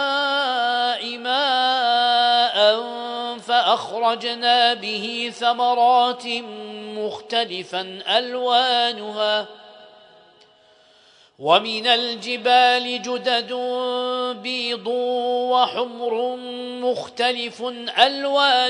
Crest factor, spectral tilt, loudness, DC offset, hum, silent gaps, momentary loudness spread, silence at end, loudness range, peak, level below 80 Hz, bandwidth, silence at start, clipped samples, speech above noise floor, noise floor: 20 dB; -2.5 dB/octave; -20 LUFS; under 0.1%; none; none; 11 LU; 0 s; 4 LU; -2 dBFS; -76 dBFS; 10.5 kHz; 0 s; under 0.1%; 33 dB; -54 dBFS